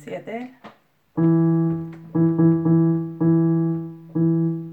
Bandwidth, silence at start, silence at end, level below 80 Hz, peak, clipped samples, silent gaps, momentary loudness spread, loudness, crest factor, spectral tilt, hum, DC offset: 3 kHz; 0.05 s; 0 s; -62 dBFS; -6 dBFS; under 0.1%; none; 14 LU; -20 LUFS; 14 dB; -11.5 dB/octave; none; under 0.1%